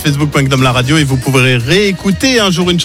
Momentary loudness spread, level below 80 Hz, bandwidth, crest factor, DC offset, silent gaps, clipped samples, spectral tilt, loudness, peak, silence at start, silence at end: 3 LU; -32 dBFS; 16 kHz; 10 dB; under 0.1%; none; under 0.1%; -5 dB/octave; -10 LUFS; 0 dBFS; 0 s; 0 s